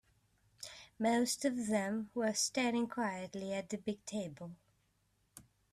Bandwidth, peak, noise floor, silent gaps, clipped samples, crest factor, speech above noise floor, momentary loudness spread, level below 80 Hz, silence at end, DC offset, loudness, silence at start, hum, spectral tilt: 14 kHz; -20 dBFS; -77 dBFS; none; under 0.1%; 18 dB; 40 dB; 17 LU; -76 dBFS; 0.3 s; under 0.1%; -36 LUFS; 0.6 s; none; -3.5 dB/octave